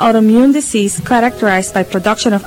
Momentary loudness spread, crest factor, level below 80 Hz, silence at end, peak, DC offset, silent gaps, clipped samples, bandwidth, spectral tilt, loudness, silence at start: 6 LU; 10 dB; -44 dBFS; 0 s; -2 dBFS; under 0.1%; none; under 0.1%; 16.5 kHz; -4.5 dB/octave; -12 LUFS; 0 s